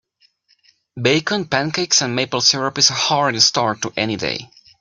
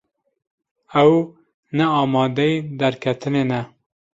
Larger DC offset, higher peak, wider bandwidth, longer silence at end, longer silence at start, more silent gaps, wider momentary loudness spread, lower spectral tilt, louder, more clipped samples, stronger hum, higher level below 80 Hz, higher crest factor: neither; about the same, 0 dBFS vs -2 dBFS; first, 12 kHz vs 7.8 kHz; second, 0.35 s vs 0.5 s; about the same, 0.95 s vs 0.9 s; second, none vs 1.54-1.63 s; second, 8 LU vs 11 LU; second, -2.5 dB/octave vs -7.5 dB/octave; about the same, -17 LUFS vs -19 LUFS; neither; neither; about the same, -58 dBFS vs -60 dBFS; about the same, 18 dB vs 18 dB